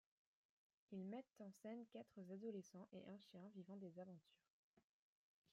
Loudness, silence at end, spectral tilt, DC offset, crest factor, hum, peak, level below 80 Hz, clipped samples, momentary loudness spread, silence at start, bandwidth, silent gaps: -58 LUFS; 0.7 s; -7 dB/octave; under 0.1%; 16 dB; none; -42 dBFS; under -90 dBFS; under 0.1%; 7 LU; 0.9 s; 11.5 kHz; 4.50-4.74 s